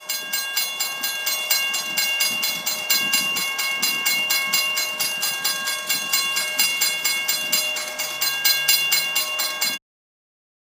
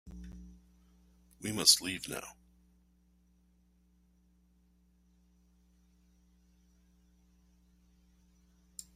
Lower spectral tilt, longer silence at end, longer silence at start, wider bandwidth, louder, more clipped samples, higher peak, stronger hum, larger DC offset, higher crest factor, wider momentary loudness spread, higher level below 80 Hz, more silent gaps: second, 2 dB/octave vs -1 dB/octave; first, 1 s vs 0.15 s; about the same, 0 s vs 0.05 s; about the same, 16 kHz vs 15.5 kHz; first, -20 LUFS vs -29 LUFS; neither; first, -2 dBFS vs -8 dBFS; neither; neither; second, 20 dB vs 32 dB; second, 6 LU vs 27 LU; second, -80 dBFS vs -62 dBFS; neither